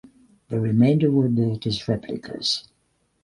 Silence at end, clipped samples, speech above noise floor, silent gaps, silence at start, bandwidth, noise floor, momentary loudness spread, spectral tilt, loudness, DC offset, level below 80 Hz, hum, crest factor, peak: 0.65 s; under 0.1%; 47 dB; none; 0.5 s; 11.5 kHz; -68 dBFS; 10 LU; -6.5 dB/octave; -22 LUFS; under 0.1%; -54 dBFS; none; 16 dB; -6 dBFS